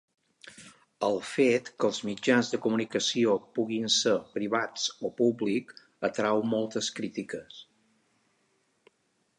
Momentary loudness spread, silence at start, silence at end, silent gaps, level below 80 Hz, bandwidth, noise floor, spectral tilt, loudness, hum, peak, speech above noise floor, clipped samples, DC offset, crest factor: 11 LU; 0.45 s; 1.75 s; none; -76 dBFS; 11 kHz; -73 dBFS; -3.5 dB/octave; -28 LUFS; none; -10 dBFS; 45 dB; under 0.1%; under 0.1%; 20 dB